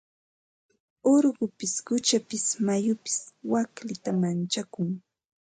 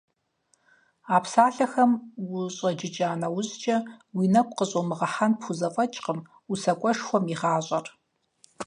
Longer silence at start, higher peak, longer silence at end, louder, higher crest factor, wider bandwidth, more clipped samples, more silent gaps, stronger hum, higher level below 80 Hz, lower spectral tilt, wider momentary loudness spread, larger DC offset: about the same, 1.05 s vs 1.05 s; second, -12 dBFS vs -4 dBFS; first, 0.5 s vs 0 s; about the same, -27 LUFS vs -26 LUFS; second, 16 dB vs 22 dB; about the same, 9.6 kHz vs 10.5 kHz; neither; neither; neither; about the same, -74 dBFS vs -74 dBFS; about the same, -4.5 dB/octave vs -5.5 dB/octave; about the same, 10 LU vs 10 LU; neither